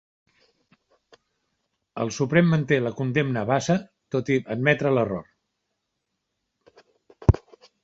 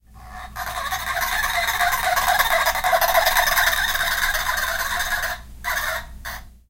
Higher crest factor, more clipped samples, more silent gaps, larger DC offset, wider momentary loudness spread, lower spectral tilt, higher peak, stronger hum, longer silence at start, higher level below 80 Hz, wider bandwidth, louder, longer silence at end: first, 24 dB vs 18 dB; neither; neither; neither; second, 10 LU vs 14 LU; first, -6.5 dB/octave vs -0.5 dB/octave; about the same, -2 dBFS vs -4 dBFS; neither; first, 1.95 s vs 0.1 s; about the same, -40 dBFS vs -38 dBFS; second, 7.8 kHz vs 17 kHz; second, -24 LUFS vs -20 LUFS; first, 0.45 s vs 0.2 s